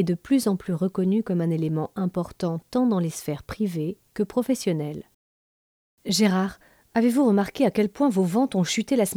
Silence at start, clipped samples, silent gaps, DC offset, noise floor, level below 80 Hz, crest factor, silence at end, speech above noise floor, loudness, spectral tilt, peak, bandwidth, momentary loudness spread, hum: 0 s; under 0.1%; 5.14-5.98 s; under 0.1%; under -90 dBFS; -58 dBFS; 16 dB; 0 s; over 67 dB; -24 LUFS; -6 dB/octave; -8 dBFS; 17.5 kHz; 9 LU; none